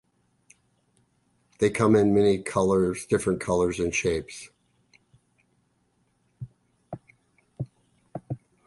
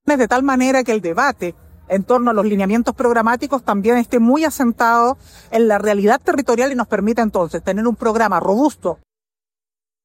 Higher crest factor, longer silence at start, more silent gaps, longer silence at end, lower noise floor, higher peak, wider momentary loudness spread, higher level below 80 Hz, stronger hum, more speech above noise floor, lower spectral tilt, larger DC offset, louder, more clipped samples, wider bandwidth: first, 20 dB vs 14 dB; first, 1.6 s vs 0.05 s; neither; second, 0.3 s vs 1.1 s; second, -70 dBFS vs under -90 dBFS; second, -8 dBFS vs -2 dBFS; first, 23 LU vs 6 LU; about the same, -52 dBFS vs -50 dBFS; first, 60 Hz at -55 dBFS vs none; second, 46 dB vs over 74 dB; about the same, -6 dB/octave vs -5.5 dB/octave; neither; second, -24 LUFS vs -16 LUFS; neither; second, 11.5 kHz vs 16.5 kHz